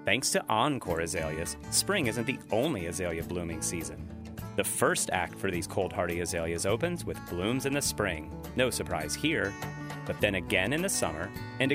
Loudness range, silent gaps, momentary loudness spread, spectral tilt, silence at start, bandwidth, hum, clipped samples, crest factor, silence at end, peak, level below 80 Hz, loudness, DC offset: 1 LU; none; 10 LU; -3.5 dB/octave; 0 s; 16 kHz; none; under 0.1%; 22 dB; 0 s; -8 dBFS; -50 dBFS; -30 LUFS; under 0.1%